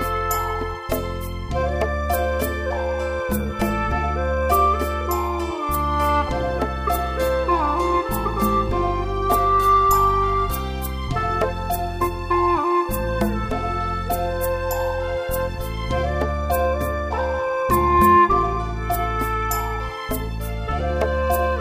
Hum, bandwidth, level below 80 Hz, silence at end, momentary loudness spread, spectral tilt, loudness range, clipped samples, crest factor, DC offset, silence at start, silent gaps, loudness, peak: none; 16 kHz; -30 dBFS; 0 s; 9 LU; -6 dB/octave; 4 LU; under 0.1%; 16 dB; under 0.1%; 0 s; none; -22 LUFS; -4 dBFS